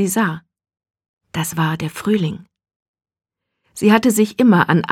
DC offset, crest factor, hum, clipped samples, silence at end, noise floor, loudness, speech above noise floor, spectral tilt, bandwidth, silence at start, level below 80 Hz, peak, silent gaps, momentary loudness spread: under 0.1%; 18 dB; none; under 0.1%; 0 s; -68 dBFS; -17 LUFS; 52 dB; -5.5 dB/octave; 17 kHz; 0 s; -56 dBFS; 0 dBFS; 1.09-1.17 s, 2.76-2.94 s; 16 LU